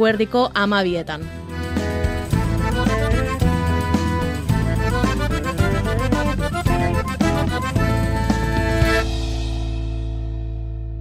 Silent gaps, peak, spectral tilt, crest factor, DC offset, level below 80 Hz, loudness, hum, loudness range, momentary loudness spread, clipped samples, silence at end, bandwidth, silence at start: none; -6 dBFS; -6 dB/octave; 14 dB; under 0.1%; -26 dBFS; -21 LUFS; none; 1 LU; 9 LU; under 0.1%; 0 s; 16 kHz; 0 s